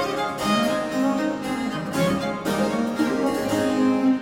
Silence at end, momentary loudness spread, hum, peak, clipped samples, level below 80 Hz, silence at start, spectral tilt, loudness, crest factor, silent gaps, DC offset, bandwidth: 0 s; 5 LU; none; -10 dBFS; under 0.1%; -52 dBFS; 0 s; -5 dB/octave; -23 LUFS; 12 dB; none; under 0.1%; 16.5 kHz